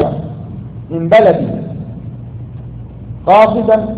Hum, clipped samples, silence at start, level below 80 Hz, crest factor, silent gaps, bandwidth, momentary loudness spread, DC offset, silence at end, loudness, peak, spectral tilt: none; under 0.1%; 0 s; -38 dBFS; 14 dB; none; 6.4 kHz; 20 LU; under 0.1%; 0 s; -12 LUFS; 0 dBFS; -8.5 dB/octave